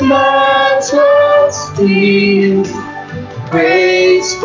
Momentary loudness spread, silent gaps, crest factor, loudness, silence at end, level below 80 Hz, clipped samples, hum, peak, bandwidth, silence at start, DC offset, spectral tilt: 15 LU; none; 10 dB; -10 LUFS; 0 s; -44 dBFS; under 0.1%; none; 0 dBFS; 7.6 kHz; 0 s; under 0.1%; -4.5 dB/octave